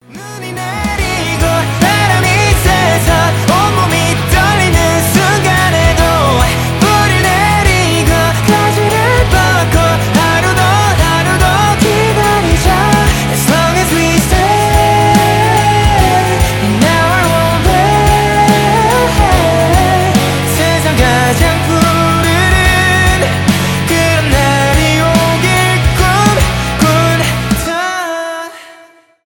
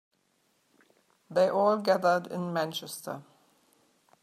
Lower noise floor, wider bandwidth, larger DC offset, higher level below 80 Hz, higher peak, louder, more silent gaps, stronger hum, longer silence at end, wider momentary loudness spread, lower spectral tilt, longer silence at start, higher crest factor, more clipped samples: second, -42 dBFS vs -72 dBFS; first, 19 kHz vs 15 kHz; neither; first, -20 dBFS vs -82 dBFS; first, 0 dBFS vs -12 dBFS; first, -10 LUFS vs -28 LUFS; neither; neither; second, 0.55 s vs 1 s; second, 3 LU vs 14 LU; about the same, -4.5 dB/octave vs -5 dB/octave; second, 0.1 s vs 1.3 s; second, 10 dB vs 20 dB; neither